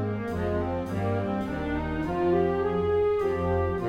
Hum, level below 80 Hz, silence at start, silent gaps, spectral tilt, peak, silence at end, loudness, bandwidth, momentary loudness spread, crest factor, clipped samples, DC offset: none; -42 dBFS; 0 s; none; -8.5 dB/octave; -16 dBFS; 0 s; -27 LUFS; 11 kHz; 5 LU; 12 dB; under 0.1%; under 0.1%